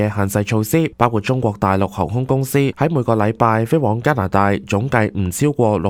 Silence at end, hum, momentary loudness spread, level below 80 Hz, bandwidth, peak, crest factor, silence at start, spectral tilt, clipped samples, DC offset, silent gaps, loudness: 0 s; none; 3 LU; -44 dBFS; 16.5 kHz; 0 dBFS; 16 dB; 0 s; -6.5 dB/octave; under 0.1%; under 0.1%; none; -17 LUFS